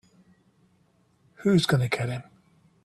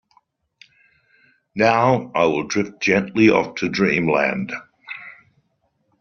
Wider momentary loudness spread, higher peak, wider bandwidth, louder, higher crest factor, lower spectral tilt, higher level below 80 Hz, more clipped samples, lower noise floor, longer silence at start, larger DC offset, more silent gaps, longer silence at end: second, 11 LU vs 19 LU; second, -10 dBFS vs -2 dBFS; first, 13 kHz vs 7 kHz; second, -25 LUFS vs -19 LUFS; about the same, 20 dB vs 18 dB; first, -6 dB/octave vs -4.5 dB/octave; about the same, -62 dBFS vs -58 dBFS; neither; about the same, -65 dBFS vs -68 dBFS; second, 1.4 s vs 1.55 s; neither; neither; second, 0.6 s vs 0.9 s